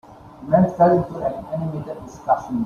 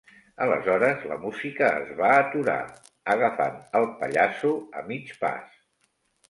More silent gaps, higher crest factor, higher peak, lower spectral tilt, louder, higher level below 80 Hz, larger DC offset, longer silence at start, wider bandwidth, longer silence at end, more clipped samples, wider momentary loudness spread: neither; about the same, 18 dB vs 18 dB; first, -2 dBFS vs -8 dBFS; first, -9.5 dB/octave vs -6 dB/octave; first, -20 LUFS vs -25 LUFS; first, -50 dBFS vs -68 dBFS; neither; second, 0.1 s vs 0.4 s; second, 7.2 kHz vs 11.5 kHz; second, 0 s vs 0.85 s; neither; first, 16 LU vs 13 LU